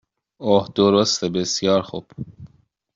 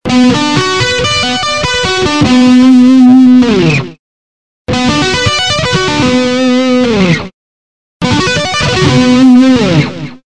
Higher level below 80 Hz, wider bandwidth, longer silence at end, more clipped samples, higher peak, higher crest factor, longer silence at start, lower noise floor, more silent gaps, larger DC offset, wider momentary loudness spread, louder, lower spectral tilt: second, -58 dBFS vs -34 dBFS; second, 7.8 kHz vs 10 kHz; first, 0.5 s vs 0.1 s; second, under 0.1% vs 1%; second, -4 dBFS vs 0 dBFS; first, 18 dB vs 8 dB; first, 0.4 s vs 0.05 s; second, -53 dBFS vs under -90 dBFS; second, none vs 3.99-4.65 s, 7.34-8.00 s; second, under 0.1% vs 2%; first, 20 LU vs 9 LU; second, -19 LUFS vs -8 LUFS; about the same, -4.5 dB/octave vs -5 dB/octave